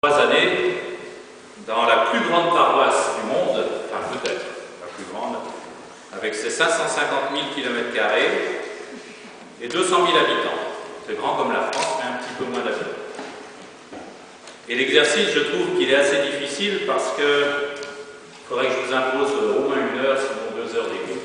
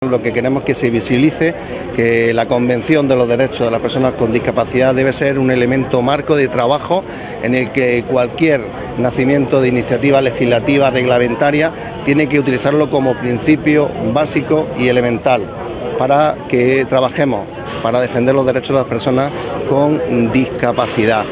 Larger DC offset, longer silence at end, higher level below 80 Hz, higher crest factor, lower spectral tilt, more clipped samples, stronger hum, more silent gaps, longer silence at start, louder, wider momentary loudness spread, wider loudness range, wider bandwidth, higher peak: neither; about the same, 0 s vs 0 s; second, -66 dBFS vs -40 dBFS; first, 20 dB vs 14 dB; second, -2.5 dB/octave vs -10.5 dB/octave; neither; neither; neither; about the same, 0.05 s vs 0 s; second, -21 LUFS vs -14 LUFS; first, 21 LU vs 5 LU; first, 6 LU vs 2 LU; first, 10 kHz vs 4 kHz; about the same, -2 dBFS vs 0 dBFS